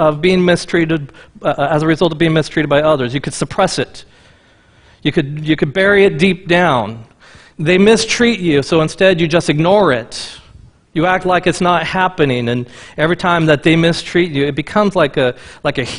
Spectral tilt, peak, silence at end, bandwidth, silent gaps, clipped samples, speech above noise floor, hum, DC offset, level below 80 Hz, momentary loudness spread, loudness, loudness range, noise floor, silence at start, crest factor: -5.5 dB/octave; 0 dBFS; 0 s; 11 kHz; none; under 0.1%; 35 dB; none; under 0.1%; -42 dBFS; 10 LU; -14 LUFS; 3 LU; -48 dBFS; 0 s; 14 dB